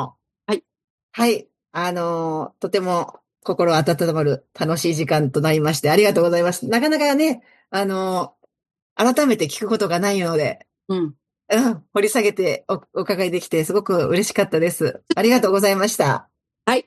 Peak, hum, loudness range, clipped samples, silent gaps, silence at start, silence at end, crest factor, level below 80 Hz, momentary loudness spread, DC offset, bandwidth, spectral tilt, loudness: -2 dBFS; none; 3 LU; under 0.1%; 0.84-1.09 s, 8.82-8.96 s; 0 s; 0.05 s; 18 dB; -64 dBFS; 10 LU; under 0.1%; 12.5 kHz; -5 dB/octave; -20 LUFS